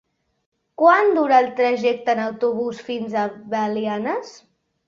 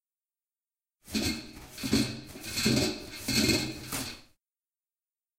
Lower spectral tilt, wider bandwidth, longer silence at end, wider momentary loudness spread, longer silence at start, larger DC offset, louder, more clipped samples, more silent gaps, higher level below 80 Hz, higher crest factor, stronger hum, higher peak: first, -5.5 dB/octave vs -3.5 dB/octave; second, 7.4 kHz vs 16.5 kHz; second, 0.55 s vs 1.15 s; second, 11 LU vs 14 LU; second, 0.8 s vs 1.05 s; neither; first, -20 LUFS vs -30 LUFS; neither; neither; second, -70 dBFS vs -52 dBFS; about the same, 18 dB vs 22 dB; neither; first, -2 dBFS vs -12 dBFS